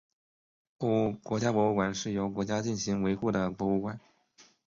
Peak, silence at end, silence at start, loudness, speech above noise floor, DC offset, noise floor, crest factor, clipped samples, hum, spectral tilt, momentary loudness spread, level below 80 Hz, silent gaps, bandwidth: -14 dBFS; 0.25 s; 0.8 s; -30 LUFS; 33 dB; under 0.1%; -62 dBFS; 16 dB; under 0.1%; none; -6 dB/octave; 5 LU; -60 dBFS; none; 7.6 kHz